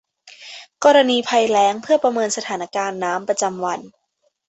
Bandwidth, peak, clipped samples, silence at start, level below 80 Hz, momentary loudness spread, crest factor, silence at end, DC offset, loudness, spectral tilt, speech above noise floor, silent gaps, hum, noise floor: 8.4 kHz; -2 dBFS; under 0.1%; 0.25 s; -68 dBFS; 14 LU; 18 dB; 0.6 s; under 0.1%; -18 LUFS; -2.5 dB/octave; 50 dB; none; none; -68 dBFS